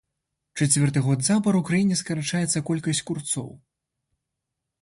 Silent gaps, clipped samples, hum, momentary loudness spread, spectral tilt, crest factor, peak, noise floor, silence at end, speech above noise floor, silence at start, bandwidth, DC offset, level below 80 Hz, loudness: none; under 0.1%; none; 8 LU; -4.5 dB/octave; 18 dB; -8 dBFS; -83 dBFS; 1.25 s; 60 dB; 0.55 s; 11.5 kHz; under 0.1%; -60 dBFS; -23 LUFS